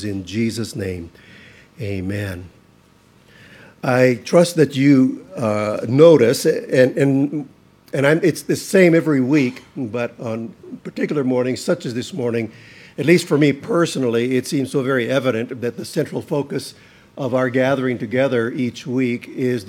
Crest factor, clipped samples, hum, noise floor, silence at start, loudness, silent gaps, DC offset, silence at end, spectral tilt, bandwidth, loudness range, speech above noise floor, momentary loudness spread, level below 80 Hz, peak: 18 dB; under 0.1%; none; -52 dBFS; 0 s; -18 LUFS; none; under 0.1%; 0 s; -6 dB/octave; 16.5 kHz; 8 LU; 34 dB; 14 LU; -60 dBFS; 0 dBFS